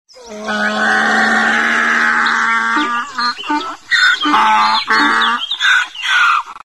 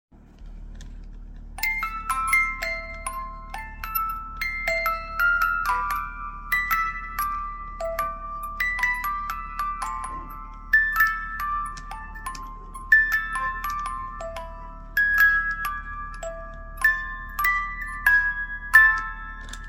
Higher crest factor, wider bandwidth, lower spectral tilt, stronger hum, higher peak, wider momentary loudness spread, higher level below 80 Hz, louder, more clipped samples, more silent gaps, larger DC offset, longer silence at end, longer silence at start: second, 14 dB vs 24 dB; second, 12.5 kHz vs 17 kHz; about the same, -1.5 dB/octave vs -2.5 dB/octave; neither; about the same, 0 dBFS vs -2 dBFS; second, 7 LU vs 19 LU; second, -56 dBFS vs -40 dBFS; first, -13 LUFS vs -23 LUFS; neither; neither; first, 0.3% vs under 0.1%; about the same, 0.1 s vs 0 s; about the same, 0.15 s vs 0.15 s